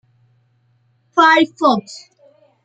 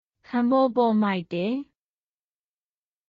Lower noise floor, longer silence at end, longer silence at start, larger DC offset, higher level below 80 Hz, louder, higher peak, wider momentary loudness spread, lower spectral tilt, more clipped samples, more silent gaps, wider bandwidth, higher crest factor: second, -60 dBFS vs under -90 dBFS; second, 0.65 s vs 1.45 s; first, 1.15 s vs 0.3 s; neither; about the same, -70 dBFS vs -70 dBFS; first, -14 LUFS vs -24 LUFS; first, -2 dBFS vs -10 dBFS; first, 23 LU vs 9 LU; second, -4 dB/octave vs -5.5 dB/octave; neither; neither; first, 8.8 kHz vs 5.2 kHz; about the same, 18 dB vs 16 dB